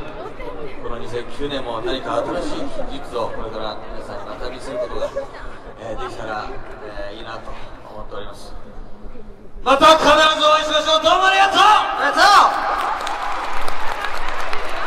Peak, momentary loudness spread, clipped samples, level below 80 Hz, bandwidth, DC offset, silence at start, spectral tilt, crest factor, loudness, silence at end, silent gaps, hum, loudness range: 0 dBFS; 22 LU; under 0.1%; -34 dBFS; 14 kHz; under 0.1%; 0 s; -2.5 dB/octave; 18 dB; -17 LUFS; 0 s; none; none; 18 LU